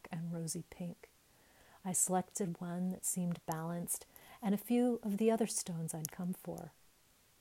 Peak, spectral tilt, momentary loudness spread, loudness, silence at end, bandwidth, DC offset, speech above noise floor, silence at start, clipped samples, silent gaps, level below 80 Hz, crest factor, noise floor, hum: -14 dBFS; -5 dB/octave; 14 LU; -38 LUFS; 0.7 s; 16 kHz; under 0.1%; 32 dB; 0.05 s; under 0.1%; none; -74 dBFS; 24 dB; -69 dBFS; none